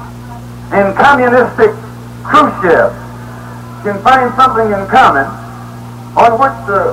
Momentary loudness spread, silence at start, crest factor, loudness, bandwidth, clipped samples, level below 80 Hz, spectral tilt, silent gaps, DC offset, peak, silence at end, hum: 20 LU; 0 s; 12 dB; -10 LUFS; 16 kHz; 0.3%; -38 dBFS; -6 dB/octave; none; under 0.1%; 0 dBFS; 0 s; 60 Hz at -30 dBFS